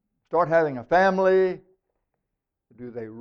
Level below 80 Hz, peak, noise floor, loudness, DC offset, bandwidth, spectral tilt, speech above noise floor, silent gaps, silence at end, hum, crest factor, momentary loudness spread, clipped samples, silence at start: -60 dBFS; -8 dBFS; -83 dBFS; -22 LUFS; under 0.1%; 6.6 kHz; -7 dB/octave; 61 dB; none; 0 s; none; 16 dB; 20 LU; under 0.1%; 0.3 s